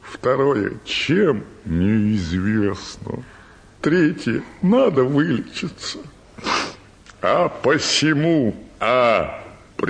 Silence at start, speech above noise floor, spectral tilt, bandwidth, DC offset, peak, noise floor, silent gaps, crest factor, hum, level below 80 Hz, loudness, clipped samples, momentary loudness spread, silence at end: 0.05 s; 26 dB; -5.5 dB/octave; 10 kHz; under 0.1%; -4 dBFS; -45 dBFS; none; 16 dB; none; -46 dBFS; -20 LUFS; under 0.1%; 14 LU; 0 s